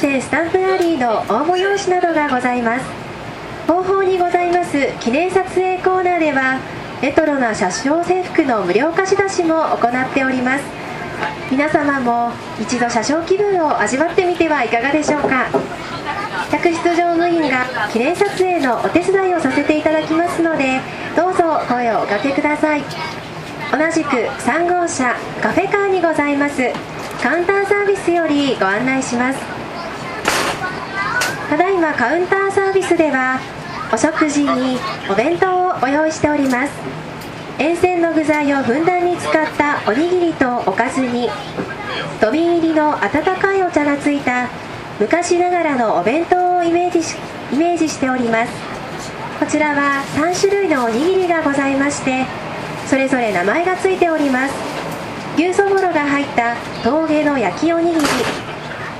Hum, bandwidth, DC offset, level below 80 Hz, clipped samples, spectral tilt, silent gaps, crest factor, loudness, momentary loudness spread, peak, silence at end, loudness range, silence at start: none; 15 kHz; under 0.1%; -48 dBFS; under 0.1%; -4.5 dB/octave; none; 16 dB; -17 LUFS; 8 LU; 0 dBFS; 0 s; 2 LU; 0 s